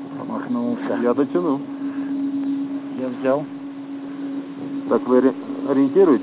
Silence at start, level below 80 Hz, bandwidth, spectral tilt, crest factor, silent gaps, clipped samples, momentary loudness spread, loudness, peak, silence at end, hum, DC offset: 0 s; -76 dBFS; 4 kHz; -11.5 dB/octave; 16 dB; none; under 0.1%; 13 LU; -22 LUFS; -4 dBFS; 0 s; none; under 0.1%